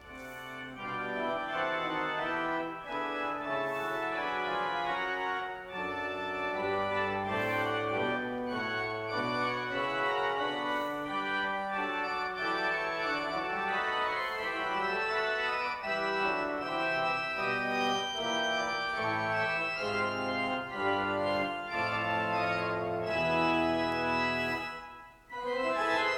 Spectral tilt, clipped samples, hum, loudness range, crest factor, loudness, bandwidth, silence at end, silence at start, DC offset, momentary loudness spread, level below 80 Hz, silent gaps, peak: -4.5 dB/octave; under 0.1%; none; 3 LU; 16 dB; -32 LUFS; 17.5 kHz; 0 s; 0 s; under 0.1%; 5 LU; -62 dBFS; none; -16 dBFS